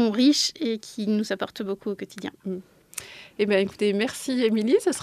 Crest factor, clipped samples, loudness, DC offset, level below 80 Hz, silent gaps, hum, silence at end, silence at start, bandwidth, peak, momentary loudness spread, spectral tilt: 18 dB; under 0.1%; -25 LUFS; under 0.1%; -68 dBFS; none; none; 0 s; 0 s; 14.5 kHz; -8 dBFS; 17 LU; -4 dB/octave